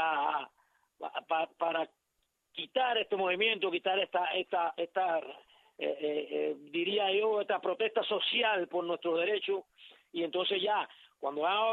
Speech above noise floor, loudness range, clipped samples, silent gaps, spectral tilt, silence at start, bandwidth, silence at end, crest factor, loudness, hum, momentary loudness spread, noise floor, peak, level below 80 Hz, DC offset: 48 dB; 3 LU; under 0.1%; none; -5.5 dB/octave; 0 s; 4.5 kHz; 0 s; 16 dB; -32 LUFS; none; 11 LU; -80 dBFS; -16 dBFS; -88 dBFS; under 0.1%